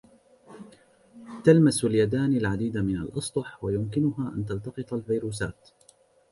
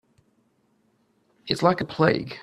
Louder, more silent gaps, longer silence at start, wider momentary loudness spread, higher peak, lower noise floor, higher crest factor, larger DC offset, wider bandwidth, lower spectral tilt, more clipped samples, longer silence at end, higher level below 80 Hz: second, -26 LUFS vs -23 LUFS; neither; second, 0.5 s vs 1.45 s; first, 14 LU vs 9 LU; about the same, -6 dBFS vs -4 dBFS; second, -60 dBFS vs -67 dBFS; about the same, 22 dB vs 24 dB; neither; second, 11.5 kHz vs 13 kHz; about the same, -6.5 dB/octave vs -6 dB/octave; neither; first, 0.8 s vs 0 s; first, -52 dBFS vs -60 dBFS